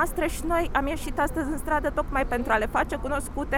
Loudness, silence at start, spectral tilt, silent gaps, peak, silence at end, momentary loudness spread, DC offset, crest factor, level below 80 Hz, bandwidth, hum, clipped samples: -27 LUFS; 0 s; -5 dB/octave; none; -10 dBFS; 0 s; 5 LU; under 0.1%; 16 dB; -34 dBFS; 17.5 kHz; none; under 0.1%